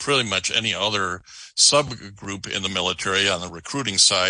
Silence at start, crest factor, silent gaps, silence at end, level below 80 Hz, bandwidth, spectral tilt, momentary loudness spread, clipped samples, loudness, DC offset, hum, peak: 0 s; 20 dB; none; 0 s; -58 dBFS; 10.5 kHz; -1.5 dB/octave; 16 LU; under 0.1%; -20 LUFS; under 0.1%; none; -2 dBFS